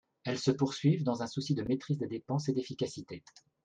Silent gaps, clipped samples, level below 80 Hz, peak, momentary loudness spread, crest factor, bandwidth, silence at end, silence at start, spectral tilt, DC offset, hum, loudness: none; under 0.1%; -68 dBFS; -14 dBFS; 9 LU; 18 dB; 9.2 kHz; 0.45 s; 0.25 s; -6.5 dB/octave; under 0.1%; none; -33 LUFS